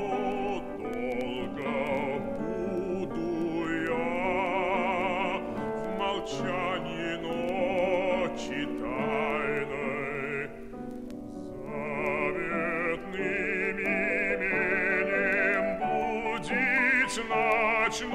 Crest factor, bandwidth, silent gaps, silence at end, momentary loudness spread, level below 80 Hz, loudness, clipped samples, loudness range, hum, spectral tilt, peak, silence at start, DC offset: 16 dB; 15 kHz; none; 0 s; 9 LU; -52 dBFS; -29 LUFS; under 0.1%; 6 LU; none; -5 dB/octave; -14 dBFS; 0 s; under 0.1%